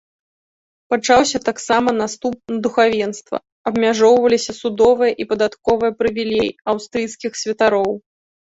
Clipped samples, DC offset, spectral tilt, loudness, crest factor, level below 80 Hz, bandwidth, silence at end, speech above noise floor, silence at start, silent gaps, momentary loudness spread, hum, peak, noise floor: under 0.1%; under 0.1%; -3.5 dB/octave; -18 LUFS; 16 dB; -52 dBFS; 8 kHz; 0.5 s; over 73 dB; 0.9 s; 3.52-3.65 s; 10 LU; none; -2 dBFS; under -90 dBFS